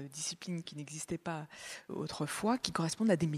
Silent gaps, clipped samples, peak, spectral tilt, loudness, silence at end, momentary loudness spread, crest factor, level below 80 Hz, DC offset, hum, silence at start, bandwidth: none; under 0.1%; -12 dBFS; -4.5 dB/octave; -37 LUFS; 0 s; 12 LU; 26 dB; -68 dBFS; under 0.1%; none; 0 s; 14.5 kHz